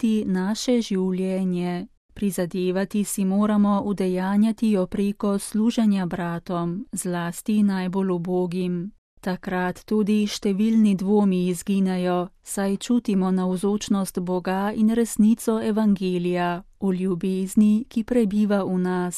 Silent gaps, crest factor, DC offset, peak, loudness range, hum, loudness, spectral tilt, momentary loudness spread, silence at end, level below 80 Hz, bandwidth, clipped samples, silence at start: 1.97-2.09 s, 8.98-9.17 s; 14 dB; under 0.1%; -8 dBFS; 3 LU; none; -23 LUFS; -6.5 dB/octave; 8 LU; 0 s; -52 dBFS; 14.5 kHz; under 0.1%; 0 s